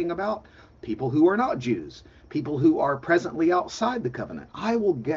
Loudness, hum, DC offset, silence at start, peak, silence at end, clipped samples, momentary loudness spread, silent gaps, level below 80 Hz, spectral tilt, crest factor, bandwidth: -25 LUFS; none; under 0.1%; 0 s; -8 dBFS; 0 s; under 0.1%; 14 LU; none; -56 dBFS; -6.5 dB/octave; 16 dB; 7.6 kHz